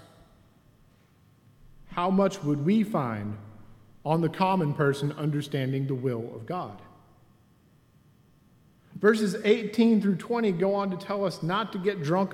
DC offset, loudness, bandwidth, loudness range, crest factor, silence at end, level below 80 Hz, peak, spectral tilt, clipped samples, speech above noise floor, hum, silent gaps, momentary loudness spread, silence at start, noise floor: under 0.1%; -27 LUFS; 14.5 kHz; 7 LU; 20 dB; 0 s; -64 dBFS; -8 dBFS; -7 dB/octave; under 0.1%; 35 dB; none; none; 12 LU; 1.85 s; -61 dBFS